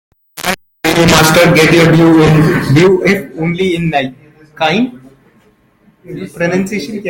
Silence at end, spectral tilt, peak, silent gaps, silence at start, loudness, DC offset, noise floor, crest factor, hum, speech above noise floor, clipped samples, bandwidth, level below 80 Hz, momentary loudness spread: 0 s; -5.5 dB/octave; 0 dBFS; none; 0.35 s; -10 LUFS; under 0.1%; -50 dBFS; 12 dB; none; 40 dB; under 0.1%; 17.5 kHz; -38 dBFS; 13 LU